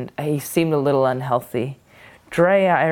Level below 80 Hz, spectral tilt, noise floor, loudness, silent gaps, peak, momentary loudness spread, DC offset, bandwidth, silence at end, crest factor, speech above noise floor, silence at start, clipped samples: -58 dBFS; -6 dB/octave; -46 dBFS; -20 LUFS; none; -4 dBFS; 11 LU; under 0.1%; 18 kHz; 0 s; 16 dB; 26 dB; 0 s; under 0.1%